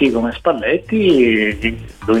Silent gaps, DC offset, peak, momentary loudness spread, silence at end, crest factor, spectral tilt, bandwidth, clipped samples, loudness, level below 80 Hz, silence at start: none; under 0.1%; -2 dBFS; 9 LU; 0 s; 14 dB; -6.5 dB/octave; 11 kHz; under 0.1%; -16 LUFS; -38 dBFS; 0 s